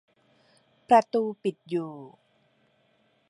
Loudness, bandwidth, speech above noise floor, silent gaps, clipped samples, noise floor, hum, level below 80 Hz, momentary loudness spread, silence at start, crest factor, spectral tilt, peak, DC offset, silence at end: -25 LUFS; 10.5 kHz; 42 dB; none; under 0.1%; -68 dBFS; none; -80 dBFS; 17 LU; 0.9 s; 22 dB; -6.5 dB/octave; -6 dBFS; under 0.1%; 1.2 s